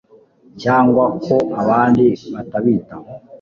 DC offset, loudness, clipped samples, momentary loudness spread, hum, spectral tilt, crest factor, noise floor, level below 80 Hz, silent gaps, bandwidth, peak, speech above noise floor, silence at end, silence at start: under 0.1%; -16 LUFS; under 0.1%; 13 LU; none; -8.5 dB/octave; 14 dB; -48 dBFS; -50 dBFS; none; 7 kHz; -2 dBFS; 33 dB; 0.05 s; 0.55 s